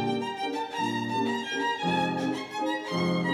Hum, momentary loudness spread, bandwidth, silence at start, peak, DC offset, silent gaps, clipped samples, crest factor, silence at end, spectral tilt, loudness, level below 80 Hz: none; 4 LU; 12.5 kHz; 0 s; -14 dBFS; under 0.1%; none; under 0.1%; 14 dB; 0 s; -5.5 dB/octave; -29 LUFS; -72 dBFS